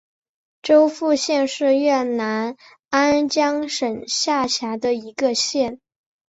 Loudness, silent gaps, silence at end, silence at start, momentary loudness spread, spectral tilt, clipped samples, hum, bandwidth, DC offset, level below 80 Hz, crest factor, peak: -20 LUFS; 2.85-2.89 s; 0.55 s; 0.65 s; 7 LU; -2.5 dB/octave; under 0.1%; none; 8.2 kHz; under 0.1%; -62 dBFS; 16 dB; -4 dBFS